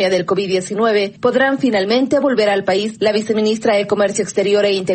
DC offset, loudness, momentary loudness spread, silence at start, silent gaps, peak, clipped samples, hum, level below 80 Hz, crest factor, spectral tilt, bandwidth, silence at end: under 0.1%; -16 LUFS; 3 LU; 0 s; none; -2 dBFS; under 0.1%; none; -58 dBFS; 12 dB; -4.5 dB/octave; 8.8 kHz; 0 s